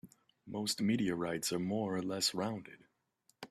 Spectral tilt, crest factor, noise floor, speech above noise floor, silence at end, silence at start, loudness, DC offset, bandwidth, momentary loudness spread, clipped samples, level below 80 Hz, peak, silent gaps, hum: -4 dB/octave; 18 dB; -75 dBFS; 40 dB; 0.05 s; 0.05 s; -36 LUFS; under 0.1%; 15 kHz; 13 LU; under 0.1%; -72 dBFS; -20 dBFS; none; none